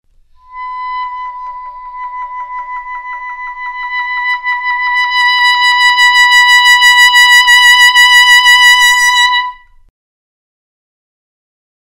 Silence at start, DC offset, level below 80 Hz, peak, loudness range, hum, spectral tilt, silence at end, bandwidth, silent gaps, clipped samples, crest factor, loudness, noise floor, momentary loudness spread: 0.5 s; under 0.1%; -46 dBFS; 0 dBFS; 18 LU; none; 6 dB/octave; 2.35 s; 16.5 kHz; none; 0.3%; 10 dB; -5 LUFS; -42 dBFS; 20 LU